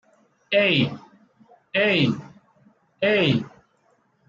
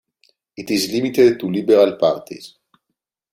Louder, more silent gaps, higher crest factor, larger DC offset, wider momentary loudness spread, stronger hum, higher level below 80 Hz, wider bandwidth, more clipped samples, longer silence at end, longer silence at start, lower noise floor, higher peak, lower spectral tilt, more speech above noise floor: second, -21 LUFS vs -17 LUFS; neither; about the same, 18 dB vs 16 dB; neither; second, 13 LU vs 21 LU; neither; about the same, -62 dBFS vs -60 dBFS; second, 7.4 kHz vs 16 kHz; neither; about the same, 0.8 s vs 0.85 s; about the same, 0.5 s vs 0.6 s; second, -64 dBFS vs -78 dBFS; second, -8 dBFS vs -2 dBFS; first, -7 dB/octave vs -5 dB/octave; second, 44 dB vs 62 dB